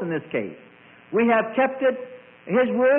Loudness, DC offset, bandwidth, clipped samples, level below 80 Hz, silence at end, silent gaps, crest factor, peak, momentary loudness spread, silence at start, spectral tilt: -23 LUFS; under 0.1%; 3.6 kHz; under 0.1%; -68 dBFS; 0 s; none; 12 dB; -10 dBFS; 16 LU; 0 s; -10.5 dB/octave